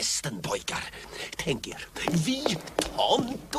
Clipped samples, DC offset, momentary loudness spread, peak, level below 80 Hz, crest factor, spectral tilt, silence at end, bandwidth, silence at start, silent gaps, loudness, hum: under 0.1%; under 0.1%; 11 LU; -10 dBFS; -52 dBFS; 20 dB; -3.5 dB/octave; 0 s; 15.5 kHz; 0 s; none; -29 LUFS; none